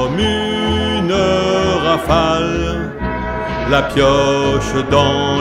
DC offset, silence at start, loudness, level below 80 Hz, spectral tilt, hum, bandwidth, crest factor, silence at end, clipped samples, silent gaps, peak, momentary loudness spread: under 0.1%; 0 s; -15 LUFS; -30 dBFS; -5.5 dB/octave; none; 15.5 kHz; 14 dB; 0 s; under 0.1%; none; 0 dBFS; 8 LU